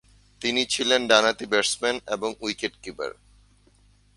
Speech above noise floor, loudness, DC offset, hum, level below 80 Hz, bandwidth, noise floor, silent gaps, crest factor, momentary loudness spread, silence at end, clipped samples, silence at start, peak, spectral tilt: 34 dB; -23 LUFS; under 0.1%; none; -58 dBFS; 11.5 kHz; -59 dBFS; none; 24 dB; 15 LU; 1.05 s; under 0.1%; 0.4 s; -2 dBFS; -1.5 dB/octave